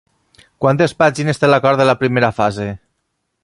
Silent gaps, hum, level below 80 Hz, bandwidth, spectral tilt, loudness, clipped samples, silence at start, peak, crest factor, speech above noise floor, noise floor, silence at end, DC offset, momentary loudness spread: none; none; -50 dBFS; 11.5 kHz; -6 dB/octave; -15 LUFS; under 0.1%; 0.6 s; 0 dBFS; 16 dB; 57 dB; -71 dBFS; 0.65 s; under 0.1%; 10 LU